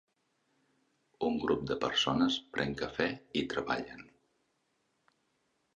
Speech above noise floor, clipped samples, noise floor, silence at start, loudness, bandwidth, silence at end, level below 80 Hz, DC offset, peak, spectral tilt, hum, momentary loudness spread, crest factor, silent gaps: 45 dB; under 0.1%; -78 dBFS; 1.2 s; -33 LUFS; 8.4 kHz; 1.75 s; -62 dBFS; under 0.1%; -14 dBFS; -4.5 dB/octave; none; 8 LU; 22 dB; none